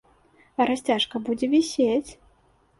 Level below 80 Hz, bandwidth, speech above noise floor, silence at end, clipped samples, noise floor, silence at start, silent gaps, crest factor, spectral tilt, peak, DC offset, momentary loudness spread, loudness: -60 dBFS; 11.5 kHz; 38 dB; 0.65 s; under 0.1%; -62 dBFS; 0.6 s; none; 16 dB; -3.5 dB/octave; -8 dBFS; under 0.1%; 8 LU; -24 LUFS